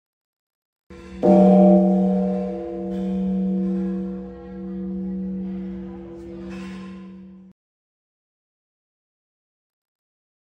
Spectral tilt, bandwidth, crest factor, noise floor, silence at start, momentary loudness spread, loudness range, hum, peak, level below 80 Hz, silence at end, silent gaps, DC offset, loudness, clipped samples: -10.5 dB/octave; 3.8 kHz; 20 dB; -41 dBFS; 0.9 s; 23 LU; 21 LU; none; -4 dBFS; -50 dBFS; 3.05 s; none; under 0.1%; -20 LUFS; under 0.1%